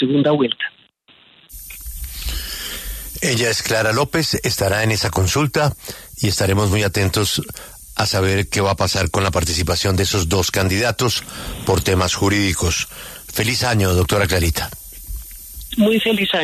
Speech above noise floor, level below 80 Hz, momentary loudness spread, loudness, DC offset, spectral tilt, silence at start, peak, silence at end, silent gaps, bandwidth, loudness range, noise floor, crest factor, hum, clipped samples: 34 dB; -34 dBFS; 15 LU; -18 LUFS; under 0.1%; -4 dB/octave; 0 s; -4 dBFS; 0 s; none; 14 kHz; 3 LU; -52 dBFS; 16 dB; none; under 0.1%